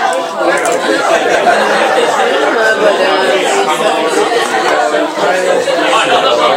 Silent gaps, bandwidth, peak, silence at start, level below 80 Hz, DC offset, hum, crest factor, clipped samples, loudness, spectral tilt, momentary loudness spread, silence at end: none; 17 kHz; 0 dBFS; 0 s; -58 dBFS; under 0.1%; none; 10 dB; under 0.1%; -11 LUFS; -2 dB/octave; 3 LU; 0 s